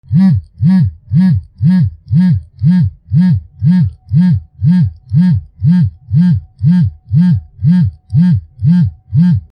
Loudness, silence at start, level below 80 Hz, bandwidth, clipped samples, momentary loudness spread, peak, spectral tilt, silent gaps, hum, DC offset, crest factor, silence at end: -12 LUFS; 0.1 s; -38 dBFS; 5.2 kHz; under 0.1%; 3 LU; -2 dBFS; -10.5 dB/octave; none; none; under 0.1%; 10 dB; 0.15 s